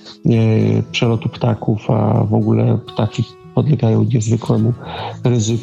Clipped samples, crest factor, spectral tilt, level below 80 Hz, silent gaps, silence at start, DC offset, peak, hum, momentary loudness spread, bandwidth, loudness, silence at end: under 0.1%; 12 dB; -7 dB/octave; -48 dBFS; none; 0.05 s; under 0.1%; -2 dBFS; none; 6 LU; 7.8 kHz; -16 LUFS; 0 s